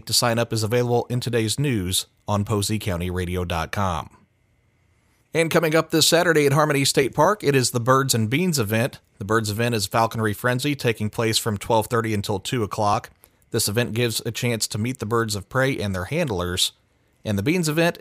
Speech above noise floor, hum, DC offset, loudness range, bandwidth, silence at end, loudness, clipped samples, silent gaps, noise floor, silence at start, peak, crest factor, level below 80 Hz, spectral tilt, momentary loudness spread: 42 dB; none; under 0.1%; 6 LU; 16 kHz; 0 s; -22 LUFS; under 0.1%; none; -63 dBFS; 0.05 s; -4 dBFS; 18 dB; -50 dBFS; -4.5 dB/octave; 8 LU